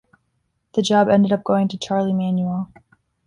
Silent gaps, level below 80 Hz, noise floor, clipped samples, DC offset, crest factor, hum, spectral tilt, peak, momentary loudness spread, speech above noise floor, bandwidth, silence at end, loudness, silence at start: none; -58 dBFS; -70 dBFS; under 0.1%; under 0.1%; 16 dB; none; -6.5 dB/octave; -4 dBFS; 10 LU; 52 dB; 11 kHz; 0.6 s; -19 LUFS; 0.75 s